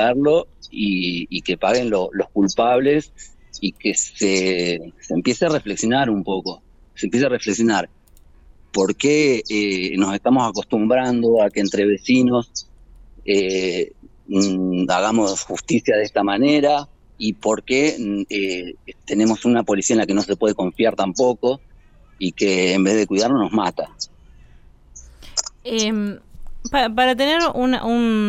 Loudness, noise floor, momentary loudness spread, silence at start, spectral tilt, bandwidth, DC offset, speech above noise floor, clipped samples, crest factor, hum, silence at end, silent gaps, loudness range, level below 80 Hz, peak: -19 LUFS; -48 dBFS; 10 LU; 0 s; -4 dB/octave; 12 kHz; under 0.1%; 30 dB; under 0.1%; 16 dB; none; 0 s; none; 3 LU; -46 dBFS; -4 dBFS